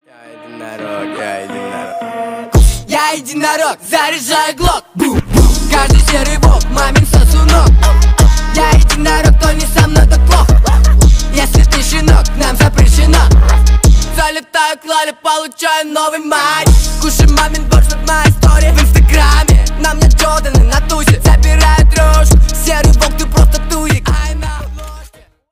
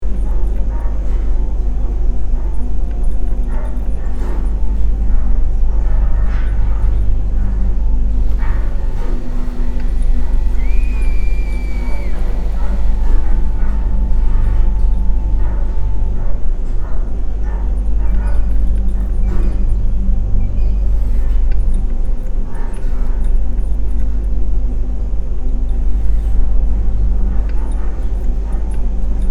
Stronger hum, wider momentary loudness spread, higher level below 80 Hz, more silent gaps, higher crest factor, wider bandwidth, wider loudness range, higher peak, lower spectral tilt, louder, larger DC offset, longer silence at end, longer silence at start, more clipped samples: neither; first, 11 LU vs 4 LU; about the same, -10 dBFS vs -14 dBFS; neither; about the same, 8 dB vs 12 dB; first, 16 kHz vs 2.7 kHz; about the same, 4 LU vs 2 LU; about the same, 0 dBFS vs 0 dBFS; second, -4.5 dB/octave vs -8.5 dB/octave; first, -10 LUFS vs -20 LUFS; neither; first, 0.45 s vs 0 s; first, 0.4 s vs 0 s; neither